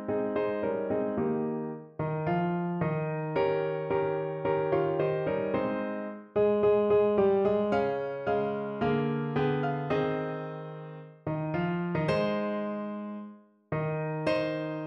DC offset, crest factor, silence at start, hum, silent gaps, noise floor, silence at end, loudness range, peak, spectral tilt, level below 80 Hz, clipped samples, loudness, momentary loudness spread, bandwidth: under 0.1%; 16 dB; 0 s; none; none; -49 dBFS; 0 s; 5 LU; -14 dBFS; -9 dB/octave; -60 dBFS; under 0.1%; -30 LUFS; 11 LU; 5.8 kHz